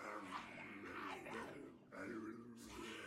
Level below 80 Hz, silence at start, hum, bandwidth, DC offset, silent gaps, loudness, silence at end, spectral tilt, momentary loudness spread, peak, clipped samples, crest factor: -76 dBFS; 0 s; none; 16 kHz; under 0.1%; none; -52 LUFS; 0 s; -4 dB/octave; 6 LU; -36 dBFS; under 0.1%; 16 dB